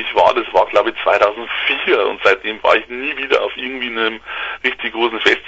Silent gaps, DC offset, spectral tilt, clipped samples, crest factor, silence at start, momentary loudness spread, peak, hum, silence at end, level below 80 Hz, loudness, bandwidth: none; under 0.1%; -3 dB/octave; under 0.1%; 16 dB; 0 s; 7 LU; 0 dBFS; none; 0 s; -52 dBFS; -16 LUFS; 8 kHz